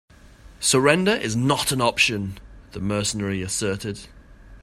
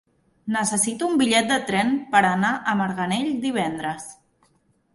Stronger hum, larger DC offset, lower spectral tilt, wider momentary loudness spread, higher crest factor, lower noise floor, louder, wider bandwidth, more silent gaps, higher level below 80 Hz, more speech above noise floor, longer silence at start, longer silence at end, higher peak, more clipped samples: neither; neither; about the same, -3.5 dB/octave vs -3.5 dB/octave; first, 15 LU vs 11 LU; about the same, 22 dB vs 20 dB; second, -47 dBFS vs -64 dBFS; about the same, -21 LUFS vs -22 LUFS; first, 16 kHz vs 12 kHz; neither; first, -48 dBFS vs -62 dBFS; second, 25 dB vs 42 dB; about the same, 0.45 s vs 0.45 s; second, 0.05 s vs 0.8 s; first, 0 dBFS vs -4 dBFS; neither